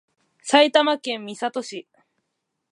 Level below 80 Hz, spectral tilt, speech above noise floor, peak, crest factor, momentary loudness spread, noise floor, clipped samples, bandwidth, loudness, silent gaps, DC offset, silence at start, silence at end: -82 dBFS; -2 dB/octave; 58 dB; -4 dBFS; 20 dB; 20 LU; -78 dBFS; under 0.1%; 11 kHz; -20 LUFS; none; under 0.1%; 0.45 s; 0.9 s